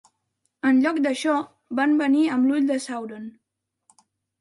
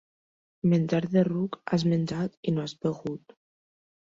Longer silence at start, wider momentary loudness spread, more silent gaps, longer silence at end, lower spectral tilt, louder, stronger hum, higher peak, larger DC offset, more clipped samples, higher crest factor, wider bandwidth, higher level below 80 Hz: about the same, 0.65 s vs 0.65 s; first, 13 LU vs 8 LU; second, none vs 2.37-2.43 s; about the same, 1.1 s vs 1 s; second, -4 dB/octave vs -8 dB/octave; first, -22 LUFS vs -28 LUFS; neither; about the same, -10 dBFS vs -10 dBFS; neither; neither; about the same, 14 dB vs 18 dB; first, 11.5 kHz vs 7.6 kHz; second, -76 dBFS vs -64 dBFS